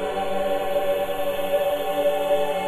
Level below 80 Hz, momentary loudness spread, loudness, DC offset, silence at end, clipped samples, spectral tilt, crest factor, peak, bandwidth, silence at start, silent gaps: -48 dBFS; 3 LU; -24 LUFS; under 0.1%; 0 s; under 0.1%; -4 dB/octave; 12 dB; -10 dBFS; 15 kHz; 0 s; none